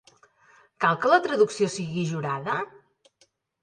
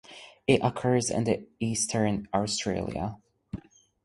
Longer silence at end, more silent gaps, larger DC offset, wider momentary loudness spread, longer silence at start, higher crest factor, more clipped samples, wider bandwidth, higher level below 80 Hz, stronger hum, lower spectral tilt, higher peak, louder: first, 1 s vs 0.45 s; neither; neither; second, 9 LU vs 18 LU; first, 0.8 s vs 0.1 s; about the same, 22 dB vs 22 dB; neither; second, 10 kHz vs 11.5 kHz; second, -72 dBFS vs -54 dBFS; neither; about the same, -5 dB/octave vs -4.5 dB/octave; about the same, -6 dBFS vs -6 dBFS; first, -25 LUFS vs -28 LUFS